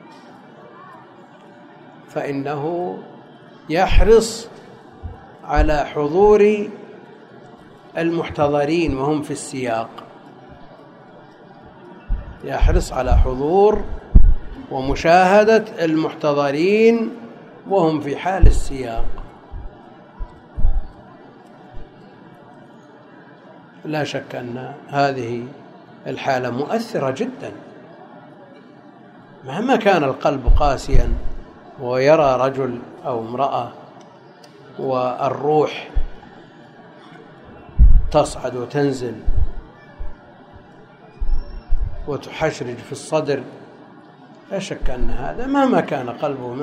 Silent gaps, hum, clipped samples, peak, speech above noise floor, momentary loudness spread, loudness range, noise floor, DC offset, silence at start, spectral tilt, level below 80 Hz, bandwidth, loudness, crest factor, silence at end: none; none; under 0.1%; 0 dBFS; 27 dB; 24 LU; 13 LU; -44 dBFS; under 0.1%; 0.8 s; -6.5 dB/octave; -24 dBFS; 10.5 kHz; -20 LUFS; 18 dB; 0 s